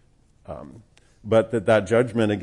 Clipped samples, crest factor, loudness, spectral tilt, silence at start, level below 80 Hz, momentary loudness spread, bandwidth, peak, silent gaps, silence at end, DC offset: under 0.1%; 18 dB; -21 LUFS; -6.5 dB/octave; 0.5 s; -56 dBFS; 20 LU; 11 kHz; -6 dBFS; none; 0 s; under 0.1%